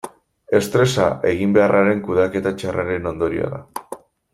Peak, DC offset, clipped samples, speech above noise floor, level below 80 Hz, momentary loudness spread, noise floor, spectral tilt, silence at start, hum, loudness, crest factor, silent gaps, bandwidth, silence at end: -2 dBFS; under 0.1%; under 0.1%; 20 dB; -50 dBFS; 18 LU; -38 dBFS; -6 dB/octave; 0.05 s; none; -19 LUFS; 18 dB; none; 16 kHz; 0.4 s